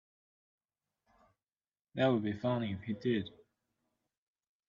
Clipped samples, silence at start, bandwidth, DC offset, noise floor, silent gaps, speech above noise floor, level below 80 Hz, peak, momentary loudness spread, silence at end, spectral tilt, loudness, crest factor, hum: under 0.1%; 1.95 s; 7.2 kHz; under 0.1%; under -90 dBFS; none; over 56 dB; -76 dBFS; -18 dBFS; 11 LU; 1.4 s; -8.5 dB/octave; -34 LUFS; 20 dB; none